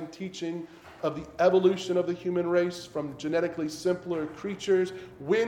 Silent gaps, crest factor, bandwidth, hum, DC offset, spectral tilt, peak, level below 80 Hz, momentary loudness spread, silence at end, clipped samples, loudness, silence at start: none; 18 dB; 12 kHz; none; under 0.1%; -6 dB/octave; -10 dBFS; -64 dBFS; 12 LU; 0 s; under 0.1%; -29 LUFS; 0 s